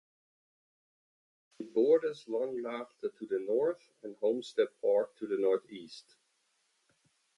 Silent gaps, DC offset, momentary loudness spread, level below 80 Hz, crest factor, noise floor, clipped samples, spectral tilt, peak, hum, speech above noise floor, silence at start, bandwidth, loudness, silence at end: none; under 0.1%; 19 LU; -86 dBFS; 18 dB; -76 dBFS; under 0.1%; -5.5 dB/octave; -16 dBFS; none; 44 dB; 1.6 s; 11 kHz; -33 LUFS; 1.35 s